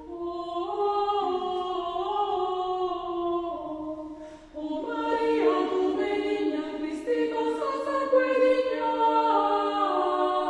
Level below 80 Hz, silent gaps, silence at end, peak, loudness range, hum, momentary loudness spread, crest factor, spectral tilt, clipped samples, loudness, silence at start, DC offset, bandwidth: -60 dBFS; none; 0 s; -10 dBFS; 6 LU; none; 11 LU; 16 dB; -5 dB/octave; under 0.1%; -27 LUFS; 0 s; under 0.1%; 11 kHz